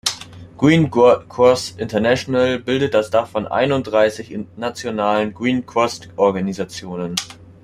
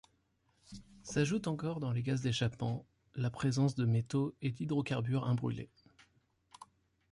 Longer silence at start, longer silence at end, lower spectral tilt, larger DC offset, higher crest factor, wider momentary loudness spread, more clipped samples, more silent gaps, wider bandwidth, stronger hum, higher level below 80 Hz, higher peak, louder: second, 0.05 s vs 0.7 s; second, 0.2 s vs 0.45 s; second, -5 dB/octave vs -6.5 dB/octave; neither; about the same, 16 dB vs 16 dB; second, 13 LU vs 16 LU; neither; neither; first, 14.5 kHz vs 11.5 kHz; neither; first, -52 dBFS vs -64 dBFS; first, -2 dBFS vs -20 dBFS; first, -18 LUFS vs -35 LUFS